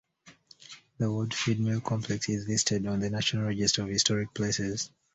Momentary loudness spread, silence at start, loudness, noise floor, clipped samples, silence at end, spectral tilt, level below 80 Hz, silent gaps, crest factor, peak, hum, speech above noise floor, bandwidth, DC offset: 7 LU; 0.25 s; -29 LUFS; -57 dBFS; under 0.1%; 0.25 s; -4 dB/octave; -58 dBFS; none; 22 dB; -10 dBFS; none; 28 dB; 8.4 kHz; under 0.1%